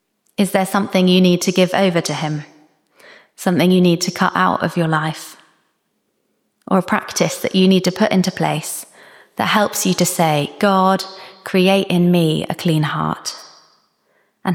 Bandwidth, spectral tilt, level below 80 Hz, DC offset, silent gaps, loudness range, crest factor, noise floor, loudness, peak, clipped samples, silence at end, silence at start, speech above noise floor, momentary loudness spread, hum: 17.5 kHz; -5 dB/octave; -60 dBFS; under 0.1%; none; 3 LU; 16 dB; -68 dBFS; -17 LUFS; -2 dBFS; under 0.1%; 0 s; 0.4 s; 52 dB; 12 LU; none